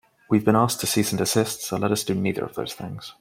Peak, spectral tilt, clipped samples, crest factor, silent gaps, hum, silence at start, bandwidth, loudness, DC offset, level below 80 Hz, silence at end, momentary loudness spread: -4 dBFS; -4.5 dB/octave; under 0.1%; 20 dB; none; none; 0.3 s; 16.5 kHz; -23 LUFS; under 0.1%; -60 dBFS; 0.1 s; 12 LU